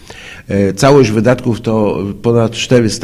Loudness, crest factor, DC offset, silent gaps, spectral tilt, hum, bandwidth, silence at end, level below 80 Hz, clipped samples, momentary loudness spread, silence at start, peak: -12 LUFS; 12 dB; under 0.1%; none; -6 dB/octave; none; 15.5 kHz; 0 s; -38 dBFS; 0.3%; 9 LU; 0.1 s; 0 dBFS